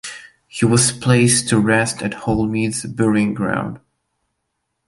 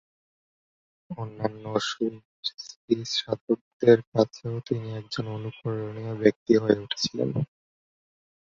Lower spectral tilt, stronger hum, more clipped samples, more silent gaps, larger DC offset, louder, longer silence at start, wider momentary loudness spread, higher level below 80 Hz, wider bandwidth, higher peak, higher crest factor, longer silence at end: about the same, -4.5 dB/octave vs -5.5 dB/octave; neither; neither; second, none vs 2.25-2.43 s, 2.76-2.88 s, 3.41-3.47 s, 3.61-3.80 s, 4.07-4.12 s, 6.36-6.46 s; neither; first, -17 LUFS vs -27 LUFS; second, 0.05 s vs 1.1 s; about the same, 13 LU vs 13 LU; first, -46 dBFS vs -64 dBFS; first, 12 kHz vs 7.8 kHz; about the same, -2 dBFS vs -4 dBFS; second, 16 dB vs 24 dB; about the same, 1.1 s vs 1.05 s